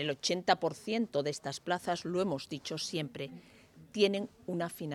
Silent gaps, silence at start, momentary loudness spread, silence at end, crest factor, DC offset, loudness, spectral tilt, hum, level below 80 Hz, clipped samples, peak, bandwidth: none; 0 s; 10 LU; 0 s; 22 dB; under 0.1%; -34 LUFS; -4.5 dB/octave; none; -74 dBFS; under 0.1%; -12 dBFS; 15 kHz